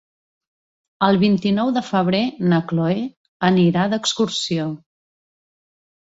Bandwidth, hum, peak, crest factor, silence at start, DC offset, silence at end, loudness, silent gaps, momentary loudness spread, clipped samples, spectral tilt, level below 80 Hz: 8 kHz; none; -2 dBFS; 18 dB; 1 s; under 0.1%; 1.35 s; -19 LUFS; 3.17-3.40 s; 8 LU; under 0.1%; -5.5 dB/octave; -58 dBFS